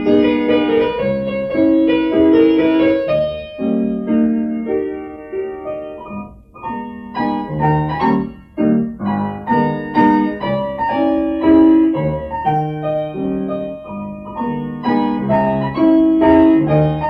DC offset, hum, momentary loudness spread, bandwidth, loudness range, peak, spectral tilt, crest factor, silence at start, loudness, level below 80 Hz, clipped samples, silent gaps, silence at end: under 0.1%; none; 15 LU; 5.4 kHz; 6 LU; -2 dBFS; -9.5 dB/octave; 14 dB; 0 s; -16 LUFS; -42 dBFS; under 0.1%; none; 0 s